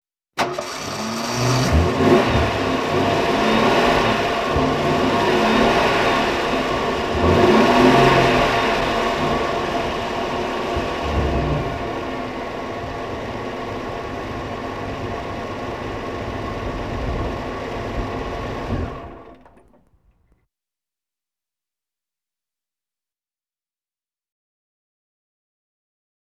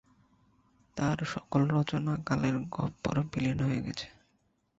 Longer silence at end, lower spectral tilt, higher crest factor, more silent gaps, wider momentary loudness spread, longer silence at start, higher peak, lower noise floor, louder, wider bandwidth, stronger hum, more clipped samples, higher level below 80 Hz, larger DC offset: first, 6.95 s vs 0.7 s; second, -5.5 dB/octave vs -7 dB/octave; about the same, 20 dB vs 18 dB; neither; first, 13 LU vs 9 LU; second, 0.35 s vs 0.95 s; first, -2 dBFS vs -14 dBFS; first, under -90 dBFS vs -73 dBFS; first, -20 LUFS vs -32 LUFS; first, 14.5 kHz vs 8 kHz; neither; neither; first, -34 dBFS vs -56 dBFS; first, 0.2% vs under 0.1%